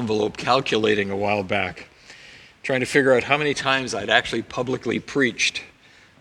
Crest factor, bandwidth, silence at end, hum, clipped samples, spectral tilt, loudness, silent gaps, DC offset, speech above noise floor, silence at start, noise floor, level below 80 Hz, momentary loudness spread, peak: 22 dB; 12.5 kHz; 0.5 s; none; under 0.1%; -4 dB/octave; -21 LUFS; none; under 0.1%; 30 dB; 0 s; -52 dBFS; -56 dBFS; 9 LU; 0 dBFS